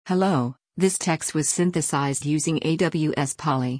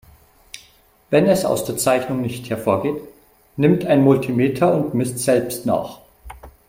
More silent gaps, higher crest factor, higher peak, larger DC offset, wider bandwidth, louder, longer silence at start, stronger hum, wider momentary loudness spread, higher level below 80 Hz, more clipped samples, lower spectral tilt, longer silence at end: neither; about the same, 14 dB vs 18 dB; second, -8 dBFS vs -2 dBFS; neither; second, 10.5 kHz vs 16.5 kHz; second, -23 LUFS vs -19 LUFS; second, 0.05 s vs 0.55 s; neither; second, 3 LU vs 19 LU; second, -60 dBFS vs -50 dBFS; neither; about the same, -5 dB/octave vs -6 dB/octave; second, 0 s vs 0.2 s